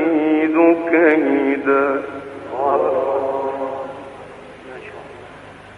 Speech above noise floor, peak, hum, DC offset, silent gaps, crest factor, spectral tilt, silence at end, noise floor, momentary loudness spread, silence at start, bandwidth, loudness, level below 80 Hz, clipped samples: 22 dB; -2 dBFS; none; under 0.1%; none; 16 dB; -7 dB/octave; 0 s; -39 dBFS; 23 LU; 0 s; 4.7 kHz; -17 LUFS; -58 dBFS; under 0.1%